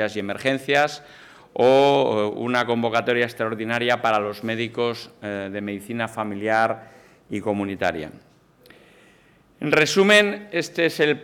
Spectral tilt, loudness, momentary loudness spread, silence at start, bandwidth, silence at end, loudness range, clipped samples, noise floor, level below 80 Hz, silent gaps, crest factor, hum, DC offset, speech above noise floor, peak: -4.5 dB/octave; -21 LUFS; 14 LU; 0 s; 18 kHz; 0 s; 6 LU; under 0.1%; -56 dBFS; -64 dBFS; none; 16 dB; none; under 0.1%; 34 dB; -6 dBFS